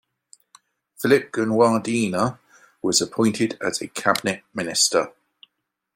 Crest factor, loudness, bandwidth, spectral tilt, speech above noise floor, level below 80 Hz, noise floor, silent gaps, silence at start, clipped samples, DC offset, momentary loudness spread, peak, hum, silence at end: 20 dB; -21 LUFS; 16.5 kHz; -3.5 dB/octave; 55 dB; -64 dBFS; -76 dBFS; none; 1 s; under 0.1%; under 0.1%; 8 LU; -2 dBFS; none; 0.85 s